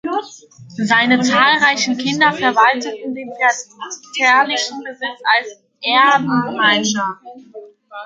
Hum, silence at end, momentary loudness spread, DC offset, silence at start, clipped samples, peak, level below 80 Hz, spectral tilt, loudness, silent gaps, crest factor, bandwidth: none; 0 s; 15 LU; under 0.1%; 0.05 s; under 0.1%; 0 dBFS; -66 dBFS; -2.5 dB/octave; -15 LUFS; none; 16 dB; 9.2 kHz